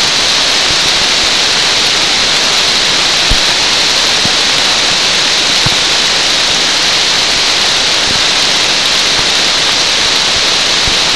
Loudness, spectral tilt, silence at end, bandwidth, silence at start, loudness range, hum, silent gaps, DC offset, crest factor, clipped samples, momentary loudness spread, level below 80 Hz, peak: -7 LUFS; 0 dB/octave; 0 s; 12 kHz; 0 s; 0 LU; none; none; 2%; 10 dB; under 0.1%; 0 LU; -32 dBFS; 0 dBFS